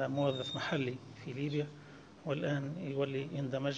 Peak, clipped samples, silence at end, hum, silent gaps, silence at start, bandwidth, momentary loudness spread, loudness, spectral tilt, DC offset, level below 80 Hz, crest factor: -20 dBFS; under 0.1%; 0 s; none; none; 0 s; 7.8 kHz; 12 LU; -37 LUFS; -6.5 dB/octave; under 0.1%; -72 dBFS; 16 dB